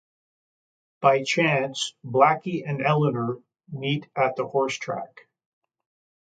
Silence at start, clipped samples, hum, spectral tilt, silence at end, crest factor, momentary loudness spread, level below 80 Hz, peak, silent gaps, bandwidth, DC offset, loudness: 1 s; under 0.1%; none; -5 dB/octave; 1.15 s; 22 dB; 12 LU; -72 dBFS; -4 dBFS; none; 9.2 kHz; under 0.1%; -24 LUFS